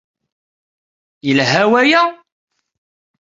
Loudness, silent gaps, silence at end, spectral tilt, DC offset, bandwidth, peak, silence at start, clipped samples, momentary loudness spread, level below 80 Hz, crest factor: -13 LUFS; none; 1.1 s; -4.5 dB/octave; under 0.1%; 7.8 kHz; -2 dBFS; 1.25 s; under 0.1%; 8 LU; -60 dBFS; 16 dB